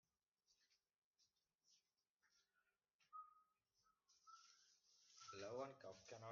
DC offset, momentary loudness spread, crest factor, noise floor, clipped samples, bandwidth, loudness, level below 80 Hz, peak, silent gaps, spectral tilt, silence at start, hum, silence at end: under 0.1%; 15 LU; 22 dB; under -90 dBFS; under 0.1%; 7.2 kHz; -59 LUFS; under -90 dBFS; -40 dBFS; 0.98-1.13 s, 1.55-1.59 s, 2.09-2.15 s, 2.94-2.99 s; -3.5 dB/octave; 0.5 s; none; 0 s